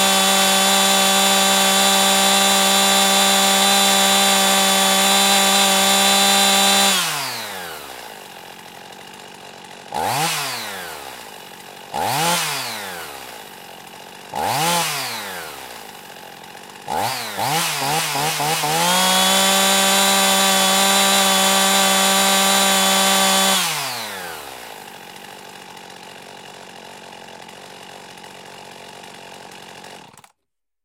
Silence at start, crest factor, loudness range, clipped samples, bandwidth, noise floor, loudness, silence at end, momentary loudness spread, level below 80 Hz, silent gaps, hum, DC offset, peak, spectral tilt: 0 s; 16 dB; 13 LU; under 0.1%; 16.5 kHz; -82 dBFS; -15 LUFS; 0.85 s; 24 LU; -60 dBFS; none; none; under 0.1%; -2 dBFS; -1 dB/octave